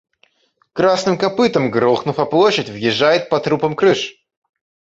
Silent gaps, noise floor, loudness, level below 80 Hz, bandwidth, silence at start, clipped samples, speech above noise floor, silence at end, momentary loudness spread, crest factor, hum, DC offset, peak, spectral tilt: none; -62 dBFS; -16 LUFS; -56 dBFS; 7.8 kHz; 0.75 s; under 0.1%; 46 dB; 0.75 s; 5 LU; 16 dB; none; under 0.1%; -2 dBFS; -5 dB/octave